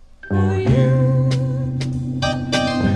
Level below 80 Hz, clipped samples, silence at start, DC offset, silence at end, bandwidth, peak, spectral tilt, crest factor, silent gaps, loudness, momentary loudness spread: -38 dBFS; under 0.1%; 0.25 s; under 0.1%; 0 s; 10 kHz; -4 dBFS; -7 dB/octave; 14 dB; none; -19 LUFS; 8 LU